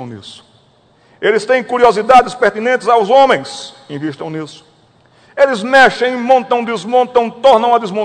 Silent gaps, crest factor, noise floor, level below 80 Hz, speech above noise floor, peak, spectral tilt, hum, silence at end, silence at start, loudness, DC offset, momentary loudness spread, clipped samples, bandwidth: none; 14 dB; -51 dBFS; -52 dBFS; 38 dB; 0 dBFS; -4 dB/octave; none; 0 s; 0 s; -12 LUFS; under 0.1%; 18 LU; 1%; 11 kHz